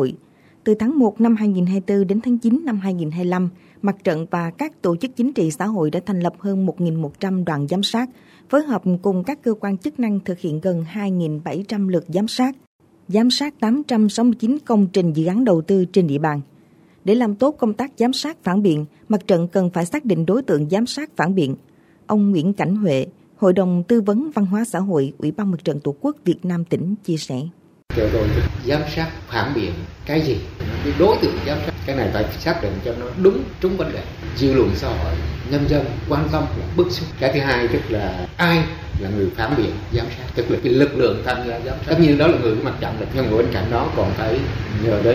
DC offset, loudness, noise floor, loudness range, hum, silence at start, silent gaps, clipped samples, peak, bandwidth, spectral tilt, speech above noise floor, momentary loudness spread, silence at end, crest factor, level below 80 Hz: under 0.1%; -20 LUFS; -51 dBFS; 4 LU; none; 0 s; 12.67-12.79 s; under 0.1%; -2 dBFS; 16 kHz; -7 dB/octave; 32 dB; 8 LU; 0 s; 16 dB; -36 dBFS